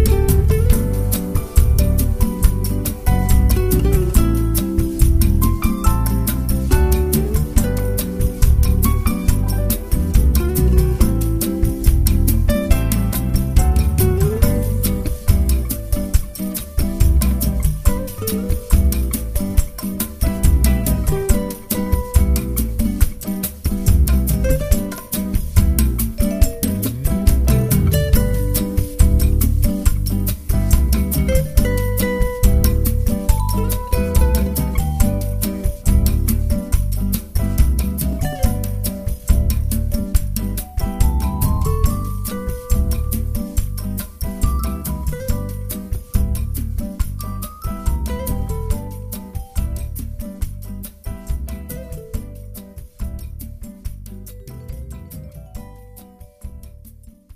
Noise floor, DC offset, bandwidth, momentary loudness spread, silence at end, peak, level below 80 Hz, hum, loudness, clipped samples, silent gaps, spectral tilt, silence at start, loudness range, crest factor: -42 dBFS; under 0.1%; 15.5 kHz; 13 LU; 0 s; 0 dBFS; -18 dBFS; none; -19 LUFS; under 0.1%; none; -6 dB/octave; 0 s; 11 LU; 16 dB